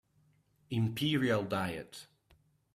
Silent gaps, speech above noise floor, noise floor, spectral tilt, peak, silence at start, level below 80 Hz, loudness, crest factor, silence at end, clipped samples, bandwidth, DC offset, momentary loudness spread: none; 38 dB; -71 dBFS; -6 dB/octave; -16 dBFS; 0.7 s; -68 dBFS; -33 LUFS; 20 dB; 0.7 s; under 0.1%; 15 kHz; under 0.1%; 16 LU